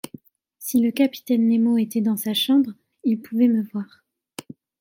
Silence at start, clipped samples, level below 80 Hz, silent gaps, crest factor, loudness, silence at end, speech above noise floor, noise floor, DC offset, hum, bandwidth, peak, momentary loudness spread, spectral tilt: 0.6 s; under 0.1%; -72 dBFS; none; 14 dB; -21 LUFS; 0.95 s; 27 dB; -47 dBFS; under 0.1%; none; 17 kHz; -8 dBFS; 20 LU; -5 dB/octave